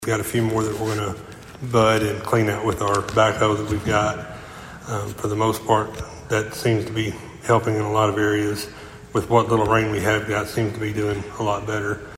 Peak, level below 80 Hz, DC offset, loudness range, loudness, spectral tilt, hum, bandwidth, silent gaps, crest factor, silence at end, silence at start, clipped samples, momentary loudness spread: -2 dBFS; -46 dBFS; under 0.1%; 3 LU; -22 LUFS; -5.5 dB/octave; none; 16.5 kHz; none; 20 dB; 0 s; 0 s; under 0.1%; 12 LU